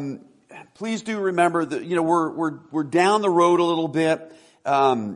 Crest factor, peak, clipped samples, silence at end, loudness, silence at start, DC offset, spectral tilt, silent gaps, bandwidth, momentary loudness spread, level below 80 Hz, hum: 16 dB; -6 dBFS; under 0.1%; 0 s; -21 LUFS; 0 s; under 0.1%; -5.5 dB/octave; none; 11 kHz; 11 LU; -70 dBFS; none